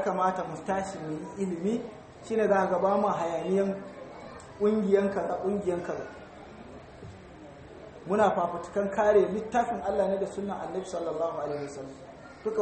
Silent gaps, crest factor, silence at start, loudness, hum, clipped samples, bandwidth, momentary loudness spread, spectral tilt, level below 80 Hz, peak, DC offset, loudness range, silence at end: none; 18 dB; 0 s; -29 LUFS; none; under 0.1%; 8.4 kHz; 22 LU; -6.5 dB/octave; -60 dBFS; -12 dBFS; under 0.1%; 5 LU; 0 s